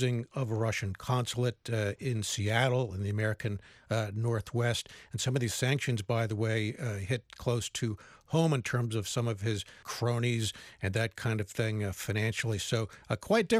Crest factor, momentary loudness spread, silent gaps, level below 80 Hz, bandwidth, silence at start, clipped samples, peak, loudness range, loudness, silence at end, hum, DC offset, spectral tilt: 18 dB; 7 LU; none; -60 dBFS; 15 kHz; 0 s; under 0.1%; -14 dBFS; 1 LU; -32 LUFS; 0 s; none; under 0.1%; -5 dB/octave